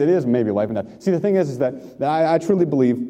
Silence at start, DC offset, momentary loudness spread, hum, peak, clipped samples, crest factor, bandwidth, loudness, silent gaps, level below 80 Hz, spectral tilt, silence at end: 0 s; under 0.1%; 7 LU; none; -4 dBFS; under 0.1%; 14 dB; 9.8 kHz; -20 LUFS; none; -62 dBFS; -8 dB/octave; 0 s